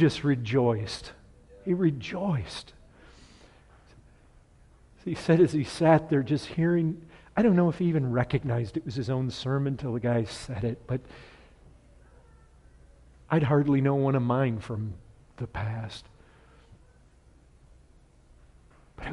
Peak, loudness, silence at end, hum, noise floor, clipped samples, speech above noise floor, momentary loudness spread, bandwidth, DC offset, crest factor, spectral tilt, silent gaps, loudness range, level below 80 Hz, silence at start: -8 dBFS; -27 LUFS; 0 s; none; -58 dBFS; under 0.1%; 31 dB; 17 LU; 11.5 kHz; under 0.1%; 20 dB; -7.5 dB/octave; none; 13 LU; -54 dBFS; 0 s